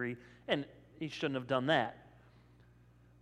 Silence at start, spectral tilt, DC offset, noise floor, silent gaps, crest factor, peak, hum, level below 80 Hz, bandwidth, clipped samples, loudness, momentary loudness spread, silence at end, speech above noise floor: 0 s; -6 dB/octave; under 0.1%; -63 dBFS; none; 22 dB; -16 dBFS; 60 Hz at -60 dBFS; -70 dBFS; 12 kHz; under 0.1%; -36 LUFS; 14 LU; 1.15 s; 27 dB